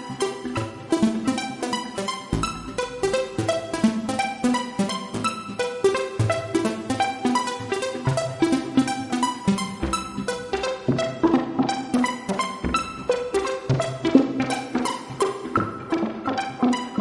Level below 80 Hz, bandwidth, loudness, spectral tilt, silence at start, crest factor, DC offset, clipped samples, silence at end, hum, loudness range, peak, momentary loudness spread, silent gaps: -46 dBFS; 11.5 kHz; -25 LUFS; -5 dB/octave; 0 s; 22 dB; under 0.1%; under 0.1%; 0 s; none; 2 LU; -2 dBFS; 6 LU; none